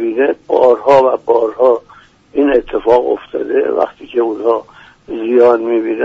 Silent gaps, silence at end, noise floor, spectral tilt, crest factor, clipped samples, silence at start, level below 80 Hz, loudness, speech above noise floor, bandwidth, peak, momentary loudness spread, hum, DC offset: none; 0 s; -44 dBFS; -6.5 dB/octave; 12 dB; under 0.1%; 0 s; -48 dBFS; -13 LUFS; 32 dB; 7.4 kHz; 0 dBFS; 9 LU; none; under 0.1%